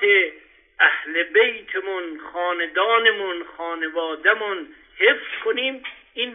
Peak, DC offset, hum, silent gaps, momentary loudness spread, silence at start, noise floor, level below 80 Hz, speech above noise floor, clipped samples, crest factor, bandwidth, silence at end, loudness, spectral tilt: -2 dBFS; under 0.1%; none; none; 13 LU; 0 s; -47 dBFS; -66 dBFS; 25 dB; under 0.1%; 20 dB; 3.9 kHz; 0 s; -21 LUFS; -4.5 dB/octave